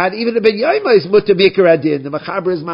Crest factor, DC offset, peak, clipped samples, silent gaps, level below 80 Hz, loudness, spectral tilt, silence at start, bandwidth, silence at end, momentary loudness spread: 14 dB; under 0.1%; 0 dBFS; under 0.1%; none; -56 dBFS; -13 LUFS; -8.5 dB/octave; 0 s; 5.4 kHz; 0 s; 9 LU